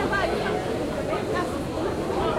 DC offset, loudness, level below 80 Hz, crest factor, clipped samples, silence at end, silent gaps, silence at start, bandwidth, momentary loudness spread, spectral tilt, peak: 0.1%; -27 LUFS; -42 dBFS; 14 dB; under 0.1%; 0 s; none; 0 s; 16.5 kHz; 4 LU; -5.5 dB/octave; -12 dBFS